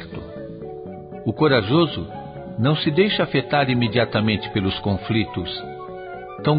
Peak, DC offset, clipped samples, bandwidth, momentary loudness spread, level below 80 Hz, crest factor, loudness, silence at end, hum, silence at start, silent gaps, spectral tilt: -4 dBFS; under 0.1%; under 0.1%; 5.2 kHz; 16 LU; -44 dBFS; 18 dB; -21 LUFS; 0 s; none; 0 s; none; -11.5 dB/octave